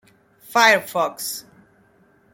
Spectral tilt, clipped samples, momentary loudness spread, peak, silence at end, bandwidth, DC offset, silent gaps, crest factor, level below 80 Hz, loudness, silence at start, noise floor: -1.5 dB/octave; under 0.1%; 14 LU; 0 dBFS; 0.95 s; 17 kHz; under 0.1%; none; 22 dB; -70 dBFS; -19 LUFS; 0.5 s; -57 dBFS